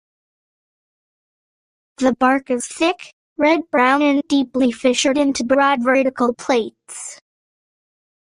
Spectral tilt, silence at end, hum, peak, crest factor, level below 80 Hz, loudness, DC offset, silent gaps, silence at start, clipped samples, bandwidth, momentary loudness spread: -3 dB/octave; 1.05 s; none; -4 dBFS; 16 dB; -60 dBFS; -17 LUFS; under 0.1%; 3.13-3.36 s; 2 s; under 0.1%; 11 kHz; 15 LU